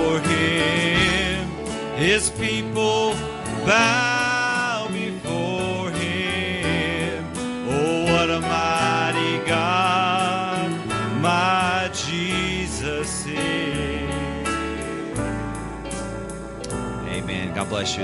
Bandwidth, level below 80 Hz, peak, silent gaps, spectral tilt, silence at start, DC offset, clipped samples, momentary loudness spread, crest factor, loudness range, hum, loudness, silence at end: 12 kHz; -42 dBFS; -2 dBFS; none; -4 dB/octave; 0 s; under 0.1%; under 0.1%; 10 LU; 20 dB; 7 LU; none; -22 LUFS; 0 s